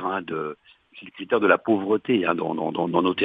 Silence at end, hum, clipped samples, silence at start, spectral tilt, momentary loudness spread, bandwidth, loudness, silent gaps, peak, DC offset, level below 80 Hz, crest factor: 0 s; none; under 0.1%; 0 s; -8.5 dB/octave; 16 LU; 4.8 kHz; -23 LUFS; none; -2 dBFS; under 0.1%; -68 dBFS; 22 dB